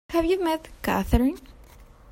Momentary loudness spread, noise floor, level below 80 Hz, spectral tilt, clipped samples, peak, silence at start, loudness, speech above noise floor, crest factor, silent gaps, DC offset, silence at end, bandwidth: 6 LU; -49 dBFS; -34 dBFS; -6.5 dB/octave; under 0.1%; -8 dBFS; 0.1 s; -25 LUFS; 25 dB; 18 dB; none; under 0.1%; 0.25 s; 16.5 kHz